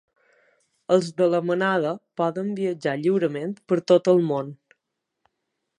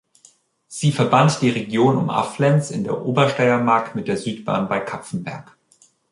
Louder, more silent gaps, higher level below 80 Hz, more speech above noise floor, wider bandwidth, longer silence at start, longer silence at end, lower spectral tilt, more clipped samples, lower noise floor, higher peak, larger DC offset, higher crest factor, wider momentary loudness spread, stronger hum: second, -23 LUFS vs -19 LUFS; neither; second, -76 dBFS vs -60 dBFS; first, 59 dB vs 38 dB; second, 10 kHz vs 11.5 kHz; first, 0.9 s vs 0.7 s; first, 1.25 s vs 0.7 s; about the same, -6.5 dB/octave vs -6 dB/octave; neither; first, -81 dBFS vs -57 dBFS; about the same, -4 dBFS vs -2 dBFS; neither; about the same, 20 dB vs 18 dB; about the same, 10 LU vs 12 LU; neither